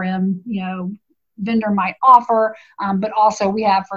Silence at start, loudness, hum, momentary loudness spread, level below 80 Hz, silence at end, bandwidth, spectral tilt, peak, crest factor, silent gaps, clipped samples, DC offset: 0 s; -17 LUFS; none; 15 LU; -60 dBFS; 0 s; 7.6 kHz; -6.5 dB/octave; 0 dBFS; 18 dB; none; under 0.1%; under 0.1%